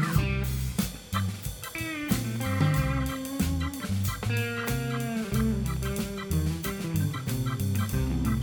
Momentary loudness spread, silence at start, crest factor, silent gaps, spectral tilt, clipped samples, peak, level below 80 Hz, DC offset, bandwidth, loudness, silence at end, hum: 5 LU; 0 s; 18 dB; none; -5.5 dB/octave; under 0.1%; -12 dBFS; -38 dBFS; under 0.1%; 19.5 kHz; -29 LUFS; 0 s; none